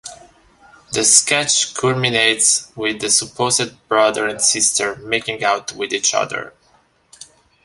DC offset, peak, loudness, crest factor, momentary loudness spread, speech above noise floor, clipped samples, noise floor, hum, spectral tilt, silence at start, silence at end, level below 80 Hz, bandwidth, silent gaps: under 0.1%; 0 dBFS; -16 LUFS; 20 dB; 11 LU; 39 dB; under 0.1%; -57 dBFS; none; -1 dB/octave; 0.05 s; 0.4 s; -56 dBFS; 14.5 kHz; none